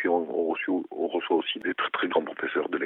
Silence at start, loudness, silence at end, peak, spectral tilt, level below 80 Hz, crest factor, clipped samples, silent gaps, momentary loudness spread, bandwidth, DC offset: 0 s; -28 LUFS; 0 s; -10 dBFS; -7 dB/octave; -80 dBFS; 18 dB; under 0.1%; none; 4 LU; 4.1 kHz; under 0.1%